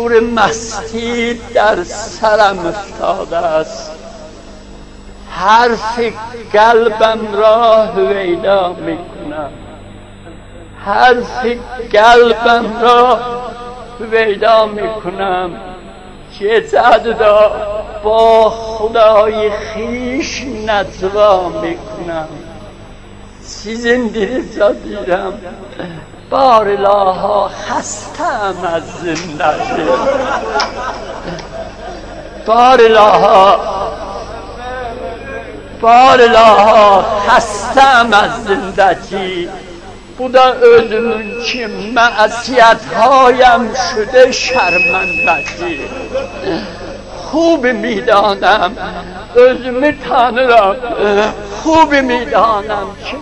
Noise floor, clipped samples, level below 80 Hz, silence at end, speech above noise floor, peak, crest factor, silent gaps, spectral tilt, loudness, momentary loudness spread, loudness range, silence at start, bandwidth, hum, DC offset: -33 dBFS; 0.6%; -36 dBFS; 0 s; 22 dB; 0 dBFS; 12 dB; none; -4 dB/octave; -11 LUFS; 18 LU; 8 LU; 0 s; 10.5 kHz; 50 Hz at -40 dBFS; under 0.1%